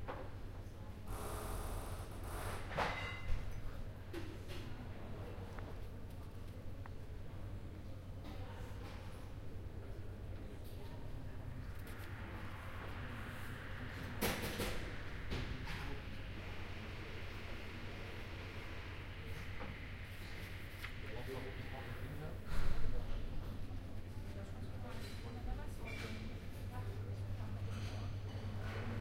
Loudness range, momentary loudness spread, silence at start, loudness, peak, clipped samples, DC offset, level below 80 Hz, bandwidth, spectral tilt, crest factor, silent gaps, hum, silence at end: 6 LU; 7 LU; 0 s; -47 LUFS; -22 dBFS; under 0.1%; under 0.1%; -48 dBFS; 16 kHz; -5.5 dB/octave; 20 dB; none; none; 0 s